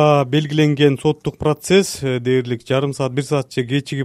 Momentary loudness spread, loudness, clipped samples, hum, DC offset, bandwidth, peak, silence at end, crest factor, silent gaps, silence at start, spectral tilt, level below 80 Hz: 6 LU; -18 LUFS; under 0.1%; none; under 0.1%; 14.5 kHz; 0 dBFS; 0 s; 16 dB; none; 0 s; -6 dB/octave; -50 dBFS